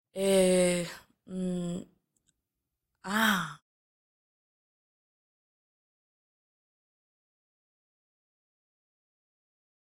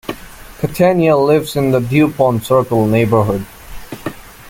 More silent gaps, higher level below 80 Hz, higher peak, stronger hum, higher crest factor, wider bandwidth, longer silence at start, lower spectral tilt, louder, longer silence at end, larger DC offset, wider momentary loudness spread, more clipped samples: neither; second, -64 dBFS vs -40 dBFS; second, -12 dBFS vs 0 dBFS; neither; first, 22 dB vs 14 dB; about the same, 16 kHz vs 17 kHz; about the same, 0.15 s vs 0.1 s; second, -4.5 dB/octave vs -7 dB/octave; second, -28 LUFS vs -14 LUFS; first, 6.25 s vs 0 s; neither; about the same, 18 LU vs 16 LU; neither